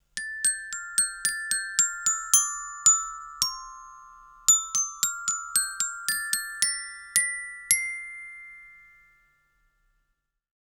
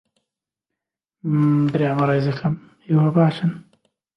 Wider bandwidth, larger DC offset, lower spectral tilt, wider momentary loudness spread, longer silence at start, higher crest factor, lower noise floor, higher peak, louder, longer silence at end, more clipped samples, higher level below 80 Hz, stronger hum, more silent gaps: first, over 20 kHz vs 5.8 kHz; neither; second, 4 dB/octave vs -9.5 dB/octave; first, 16 LU vs 11 LU; second, 0.15 s vs 1.25 s; first, 28 dB vs 16 dB; second, -77 dBFS vs -85 dBFS; first, 0 dBFS vs -4 dBFS; second, -24 LUFS vs -20 LUFS; first, 1.95 s vs 0.55 s; neither; about the same, -62 dBFS vs -60 dBFS; neither; neither